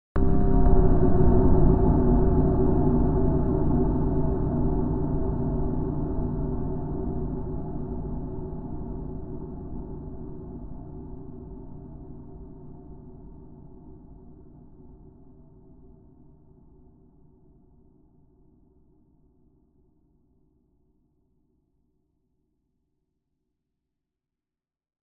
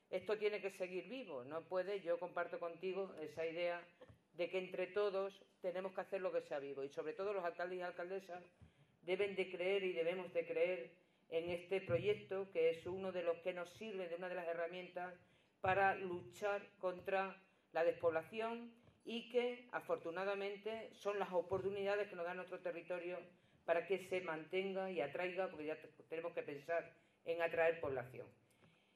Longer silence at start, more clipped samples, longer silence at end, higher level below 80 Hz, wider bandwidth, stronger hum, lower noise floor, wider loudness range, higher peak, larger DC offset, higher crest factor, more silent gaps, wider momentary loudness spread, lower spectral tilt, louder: about the same, 0.15 s vs 0.1 s; neither; first, 10.25 s vs 0.65 s; first, -32 dBFS vs -82 dBFS; second, 1.9 kHz vs 13 kHz; neither; first, under -90 dBFS vs -73 dBFS; first, 24 LU vs 3 LU; first, -6 dBFS vs -22 dBFS; neither; about the same, 20 dB vs 20 dB; neither; first, 24 LU vs 10 LU; first, -12.5 dB/octave vs -6 dB/octave; first, -26 LUFS vs -43 LUFS